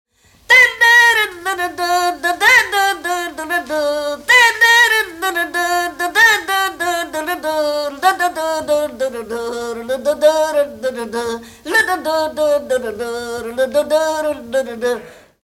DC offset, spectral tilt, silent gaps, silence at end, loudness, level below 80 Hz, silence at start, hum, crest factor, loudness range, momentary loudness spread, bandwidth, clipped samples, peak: under 0.1%; -1 dB/octave; none; 0.3 s; -15 LUFS; -52 dBFS; 0.5 s; none; 16 dB; 6 LU; 14 LU; 17 kHz; under 0.1%; 0 dBFS